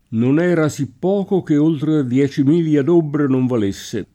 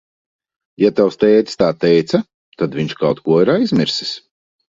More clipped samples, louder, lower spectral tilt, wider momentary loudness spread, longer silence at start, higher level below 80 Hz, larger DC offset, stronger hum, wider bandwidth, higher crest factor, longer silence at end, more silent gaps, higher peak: neither; about the same, -17 LUFS vs -16 LUFS; about the same, -7.5 dB/octave vs -6.5 dB/octave; second, 6 LU vs 9 LU; second, 0.1 s vs 0.8 s; about the same, -56 dBFS vs -54 dBFS; neither; neither; first, 13.5 kHz vs 7.8 kHz; about the same, 12 dB vs 16 dB; second, 0.1 s vs 0.55 s; second, none vs 2.34-2.52 s; second, -4 dBFS vs 0 dBFS